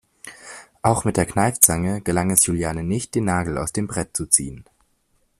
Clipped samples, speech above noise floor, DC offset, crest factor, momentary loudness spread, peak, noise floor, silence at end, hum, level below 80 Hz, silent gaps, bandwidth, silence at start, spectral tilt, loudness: under 0.1%; 45 dB; under 0.1%; 22 dB; 21 LU; 0 dBFS; -65 dBFS; 0.8 s; none; -44 dBFS; none; 15.5 kHz; 0.25 s; -4 dB/octave; -20 LUFS